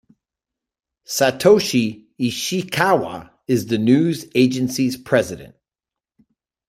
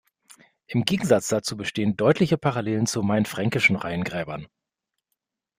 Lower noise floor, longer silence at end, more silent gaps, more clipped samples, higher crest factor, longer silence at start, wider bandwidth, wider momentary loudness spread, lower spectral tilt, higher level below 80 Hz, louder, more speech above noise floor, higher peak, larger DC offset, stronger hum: first, -88 dBFS vs -84 dBFS; about the same, 1.2 s vs 1.15 s; neither; neither; about the same, 20 dB vs 22 dB; first, 1.1 s vs 0.7 s; about the same, 16 kHz vs 15.5 kHz; about the same, 11 LU vs 9 LU; about the same, -5 dB/octave vs -5 dB/octave; about the same, -58 dBFS vs -58 dBFS; first, -19 LUFS vs -23 LUFS; first, 70 dB vs 60 dB; about the same, -2 dBFS vs -2 dBFS; neither; neither